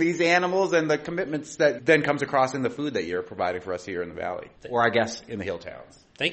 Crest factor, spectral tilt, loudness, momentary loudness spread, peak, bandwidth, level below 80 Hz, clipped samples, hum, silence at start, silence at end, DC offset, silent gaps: 20 dB; -4.5 dB/octave; -25 LUFS; 12 LU; -4 dBFS; 8.4 kHz; -62 dBFS; under 0.1%; none; 0 s; 0 s; under 0.1%; none